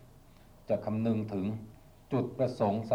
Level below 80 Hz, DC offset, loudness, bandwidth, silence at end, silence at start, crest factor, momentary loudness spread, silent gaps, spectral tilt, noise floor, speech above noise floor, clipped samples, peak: -60 dBFS; under 0.1%; -33 LUFS; 15 kHz; 0 s; 0 s; 18 dB; 7 LU; none; -9 dB/octave; -56 dBFS; 25 dB; under 0.1%; -16 dBFS